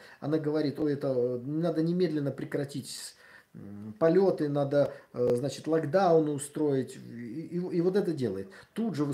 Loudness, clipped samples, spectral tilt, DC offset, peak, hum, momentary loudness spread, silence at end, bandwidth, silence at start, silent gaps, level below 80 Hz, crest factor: -29 LUFS; under 0.1%; -7 dB/octave; under 0.1%; -12 dBFS; none; 15 LU; 0 s; 15.5 kHz; 0 s; none; -74 dBFS; 18 dB